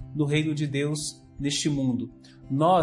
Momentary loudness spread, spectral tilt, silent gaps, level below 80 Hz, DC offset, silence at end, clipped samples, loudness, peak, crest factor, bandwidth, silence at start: 8 LU; -5 dB/octave; none; -54 dBFS; under 0.1%; 0 s; under 0.1%; -27 LUFS; -10 dBFS; 16 dB; 11.5 kHz; 0 s